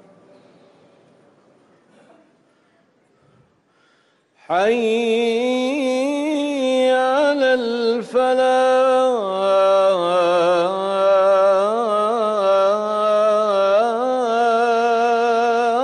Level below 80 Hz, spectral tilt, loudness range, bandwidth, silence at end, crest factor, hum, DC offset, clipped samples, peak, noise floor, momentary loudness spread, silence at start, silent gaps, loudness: -68 dBFS; -4 dB/octave; 6 LU; 11.5 kHz; 0 s; 10 dB; none; under 0.1%; under 0.1%; -8 dBFS; -60 dBFS; 5 LU; 4.5 s; none; -17 LUFS